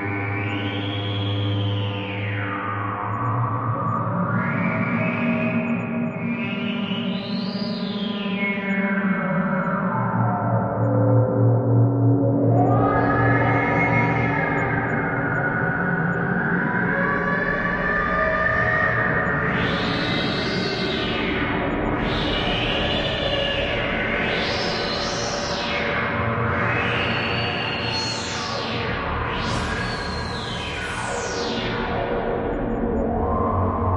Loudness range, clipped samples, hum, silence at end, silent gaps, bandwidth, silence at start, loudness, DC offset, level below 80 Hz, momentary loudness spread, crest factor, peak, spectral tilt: 6 LU; under 0.1%; none; 0 s; none; 10.5 kHz; 0 s; -22 LUFS; under 0.1%; -40 dBFS; 7 LU; 16 dB; -6 dBFS; -6 dB/octave